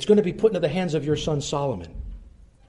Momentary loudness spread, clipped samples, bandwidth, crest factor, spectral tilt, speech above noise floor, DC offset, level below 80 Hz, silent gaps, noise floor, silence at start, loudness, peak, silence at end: 19 LU; under 0.1%; 11.5 kHz; 18 dB; -6 dB/octave; 25 dB; under 0.1%; -42 dBFS; none; -48 dBFS; 0 s; -24 LUFS; -6 dBFS; 0.4 s